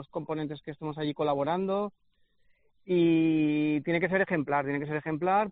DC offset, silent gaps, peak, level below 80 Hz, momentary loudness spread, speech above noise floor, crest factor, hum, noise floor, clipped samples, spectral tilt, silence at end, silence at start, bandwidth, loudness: under 0.1%; none; -12 dBFS; -66 dBFS; 10 LU; 38 dB; 16 dB; none; -66 dBFS; under 0.1%; -5.5 dB/octave; 0 s; 0 s; 4.6 kHz; -29 LUFS